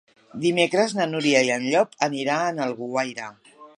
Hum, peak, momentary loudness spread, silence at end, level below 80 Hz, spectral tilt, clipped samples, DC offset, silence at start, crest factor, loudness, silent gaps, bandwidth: none; -4 dBFS; 10 LU; 0.1 s; -74 dBFS; -4 dB/octave; under 0.1%; under 0.1%; 0.35 s; 20 dB; -23 LUFS; none; 11.5 kHz